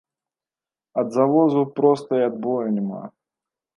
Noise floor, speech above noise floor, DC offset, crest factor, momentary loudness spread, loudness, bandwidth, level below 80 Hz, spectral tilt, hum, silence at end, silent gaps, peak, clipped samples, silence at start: under -90 dBFS; over 70 dB; under 0.1%; 18 dB; 12 LU; -21 LUFS; 11 kHz; -76 dBFS; -8.5 dB/octave; none; 0.7 s; none; -6 dBFS; under 0.1%; 0.95 s